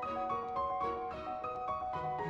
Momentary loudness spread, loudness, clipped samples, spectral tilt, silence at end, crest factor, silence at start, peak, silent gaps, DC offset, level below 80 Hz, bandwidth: 4 LU; -38 LUFS; under 0.1%; -7 dB/octave; 0 s; 12 dB; 0 s; -26 dBFS; none; under 0.1%; -60 dBFS; 7.4 kHz